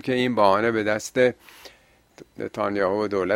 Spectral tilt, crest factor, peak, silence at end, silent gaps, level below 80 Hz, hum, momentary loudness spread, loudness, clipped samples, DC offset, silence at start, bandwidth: -5 dB/octave; 20 dB; -4 dBFS; 0 s; none; -60 dBFS; none; 13 LU; -22 LUFS; under 0.1%; under 0.1%; 0.05 s; 16 kHz